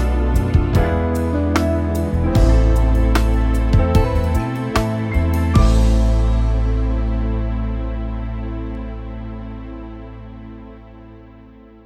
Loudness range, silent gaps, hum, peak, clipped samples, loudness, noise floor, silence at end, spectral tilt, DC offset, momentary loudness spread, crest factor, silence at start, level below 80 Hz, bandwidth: 13 LU; none; none; -2 dBFS; under 0.1%; -18 LUFS; -42 dBFS; 0.45 s; -7.5 dB/octave; under 0.1%; 17 LU; 16 dB; 0 s; -20 dBFS; 16 kHz